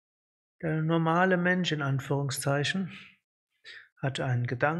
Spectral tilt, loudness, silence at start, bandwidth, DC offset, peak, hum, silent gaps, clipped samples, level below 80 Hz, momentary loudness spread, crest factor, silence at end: -5.5 dB/octave; -29 LUFS; 0.6 s; 12.5 kHz; under 0.1%; -10 dBFS; none; 3.24-3.47 s, 3.92-3.96 s; under 0.1%; -68 dBFS; 18 LU; 20 dB; 0 s